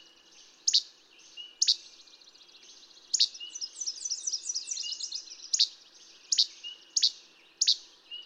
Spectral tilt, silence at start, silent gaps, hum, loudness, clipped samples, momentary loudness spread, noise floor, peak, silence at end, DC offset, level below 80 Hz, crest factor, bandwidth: 5.5 dB/octave; 0.4 s; none; none; -28 LUFS; under 0.1%; 17 LU; -57 dBFS; -10 dBFS; 0 s; under 0.1%; -88 dBFS; 24 dB; 16 kHz